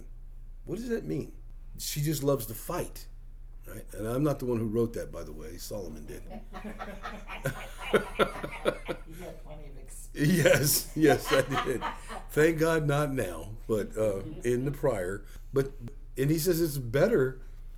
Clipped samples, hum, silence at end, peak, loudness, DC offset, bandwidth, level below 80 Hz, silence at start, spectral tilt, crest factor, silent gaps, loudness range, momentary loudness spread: under 0.1%; none; 0 s; -10 dBFS; -29 LUFS; under 0.1%; over 20 kHz; -44 dBFS; 0 s; -5 dB/octave; 20 dB; none; 8 LU; 20 LU